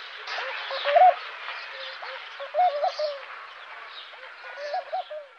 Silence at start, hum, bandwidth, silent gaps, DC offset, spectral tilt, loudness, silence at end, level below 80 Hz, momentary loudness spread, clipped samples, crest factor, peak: 0 s; none; 6.6 kHz; none; under 0.1%; 1 dB/octave; -26 LUFS; 0 s; -88 dBFS; 21 LU; under 0.1%; 20 dB; -8 dBFS